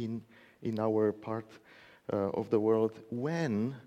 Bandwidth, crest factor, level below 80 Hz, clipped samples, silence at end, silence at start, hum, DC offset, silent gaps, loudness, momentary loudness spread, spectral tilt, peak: 8.4 kHz; 18 dB; -74 dBFS; under 0.1%; 0 s; 0 s; none; under 0.1%; none; -33 LUFS; 12 LU; -8 dB/octave; -16 dBFS